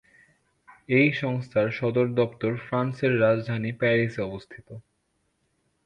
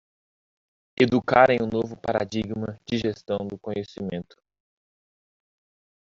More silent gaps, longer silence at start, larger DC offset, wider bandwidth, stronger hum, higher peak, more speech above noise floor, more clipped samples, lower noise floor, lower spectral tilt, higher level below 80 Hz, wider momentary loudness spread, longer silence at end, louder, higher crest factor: neither; about the same, 0.9 s vs 1 s; neither; first, 8.6 kHz vs 7.4 kHz; neither; second, -8 dBFS vs -2 dBFS; second, 48 dB vs over 66 dB; neither; second, -73 dBFS vs under -90 dBFS; first, -8.5 dB/octave vs -4.5 dB/octave; about the same, -62 dBFS vs -58 dBFS; second, 12 LU vs 15 LU; second, 1.05 s vs 1.9 s; about the same, -25 LUFS vs -25 LUFS; second, 18 dB vs 24 dB